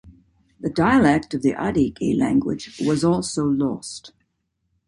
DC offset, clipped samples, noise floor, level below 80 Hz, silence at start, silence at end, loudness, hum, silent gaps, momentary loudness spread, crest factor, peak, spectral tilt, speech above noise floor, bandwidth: under 0.1%; under 0.1%; -73 dBFS; -48 dBFS; 0.05 s; 0.8 s; -21 LUFS; none; none; 13 LU; 16 dB; -4 dBFS; -6 dB/octave; 53 dB; 11.5 kHz